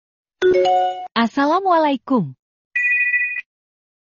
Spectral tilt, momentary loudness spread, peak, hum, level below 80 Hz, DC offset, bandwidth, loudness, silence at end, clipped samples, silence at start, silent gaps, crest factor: -3 dB/octave; 7 LU; -2 dBFS; none; -60 dBFS; under 0.1%; 7.2 kHz; -18 LUFS; 0.65 s; under 0.1%; 0.4 s; 2.39-2.70 s; 16 dB